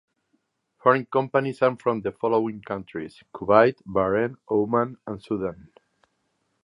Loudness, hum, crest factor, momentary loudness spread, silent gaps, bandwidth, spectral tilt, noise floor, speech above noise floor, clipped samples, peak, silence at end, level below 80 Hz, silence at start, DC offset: -24 LUFS; none; 22 dB; 14 LU; none; 10.5 kHz; -8.5 dB/octave; -73 dBFS; 50 dB; under 0.1%; -2 dBFS; 1.1 s; -58 dBFS; 0.85 s; under 0.1%